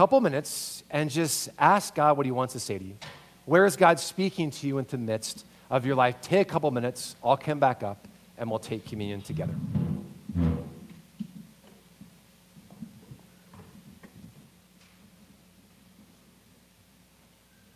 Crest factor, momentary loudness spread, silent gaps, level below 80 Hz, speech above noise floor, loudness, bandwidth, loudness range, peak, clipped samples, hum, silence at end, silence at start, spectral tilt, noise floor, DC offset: 24 dB; 21 LU; none; -52 dBFS; 34 dB; -27 LUFS; 16 kHz; 12 LU; -4 dBFS; under 0.1%; none; 3.45 s; 0 s; -5 dB/octave; -60 dBFS; under 0.1%